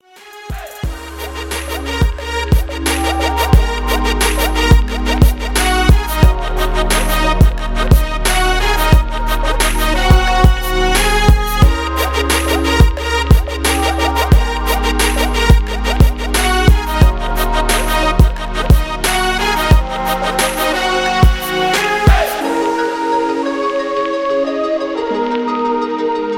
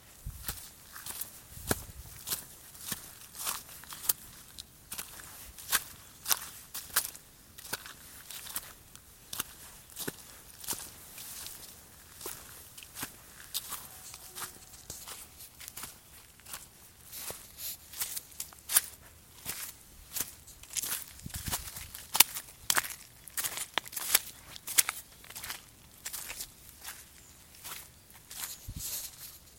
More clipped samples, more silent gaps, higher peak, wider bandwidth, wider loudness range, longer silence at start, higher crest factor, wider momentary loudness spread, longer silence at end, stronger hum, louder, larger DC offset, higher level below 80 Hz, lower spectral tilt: neither; neither; about the same, 0 dBFS vs 0 dBFS; about the same, 17.5 kHz vs 17 kHz; second, 3 LU vs 12 LU; first, 0.25 s vs 0 s; second, 12 dB vs 38 dB; second, 6 LU vs 20 LU; about the same, 0 s vs 0 s; neither; first, -14 LUFS vs -35 LUFS; neither; first, -16 dBFS vs -58 dBFS; first, -4.5 dB/octave vs 0 dB/octave